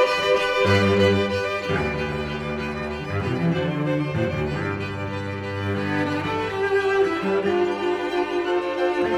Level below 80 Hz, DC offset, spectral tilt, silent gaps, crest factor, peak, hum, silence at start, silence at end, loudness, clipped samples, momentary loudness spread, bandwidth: -46 dBFS; under 0.1%; -6.5 dB/octave; none; 16 dB; -6 dBFS; none; 0 s; 0 s; -23 LUFS; under 0.1%; 9 LU; 13.5 kHz